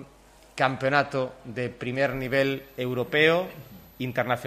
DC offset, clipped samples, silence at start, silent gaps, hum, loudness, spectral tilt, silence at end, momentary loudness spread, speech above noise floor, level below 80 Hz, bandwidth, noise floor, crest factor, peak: under 0.1%; under 0.1%; 0 s; none; none; -26 LUFS; -6 dB/octave; 0 s; 12 LU; 28 dB; -56 dBFS; 14 kHz; -54 dBFS; 22 dB; -4 dBFS